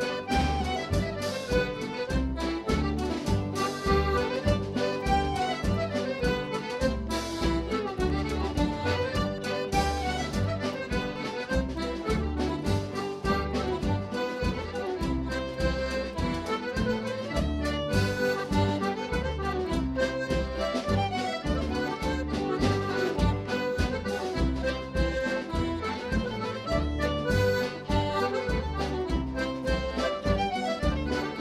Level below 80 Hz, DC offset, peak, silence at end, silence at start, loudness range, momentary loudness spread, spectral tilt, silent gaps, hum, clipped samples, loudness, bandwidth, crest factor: -36 dBFS; under 0.1%; -12 dBFS; 0 s; 0 s; 2 LU; 4 LU; -6 dB/octave; none; none; under 0.1%; -29 LUFS; 15 kHz; 16 dB